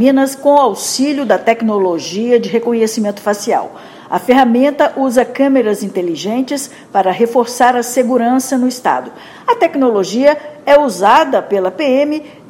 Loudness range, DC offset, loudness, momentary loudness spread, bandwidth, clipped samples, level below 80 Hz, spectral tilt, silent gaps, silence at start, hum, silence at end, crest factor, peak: 2 LU; under 0.1%; -13 LUFS; 7 LU; 16.5 kHz; 0.3%; -58 dBFS; -4 dB/octave; none; 0 s; none; 0.2 s; 12 dB; 0 dBFS